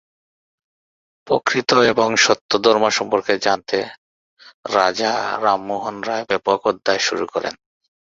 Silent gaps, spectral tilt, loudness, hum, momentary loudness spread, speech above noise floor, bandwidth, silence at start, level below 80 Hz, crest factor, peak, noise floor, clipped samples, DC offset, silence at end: 2.41-2.49 s, 3.98-4.37 s, 4.54-4.63 s; -2.5 dB/octave; -18 LUFS; none; 10 LU; over 72 dB; 7.8 kHz; 1.25 s; -60 dBFS; 20 dB; 0 dBFS; under -90 dBFS; under 0.1%; under 0.1%; 0.65 s